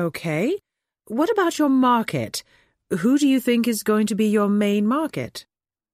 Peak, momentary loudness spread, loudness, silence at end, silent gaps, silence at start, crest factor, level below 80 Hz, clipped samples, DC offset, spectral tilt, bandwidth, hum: -8 dBFS; 12 LU; -21 LUFS; 0.55 s; none; 0 s; 14 dB; -64 dBFS; under 0.1%; under 0.1%; -5.5 dB/octave; 16 kHz; none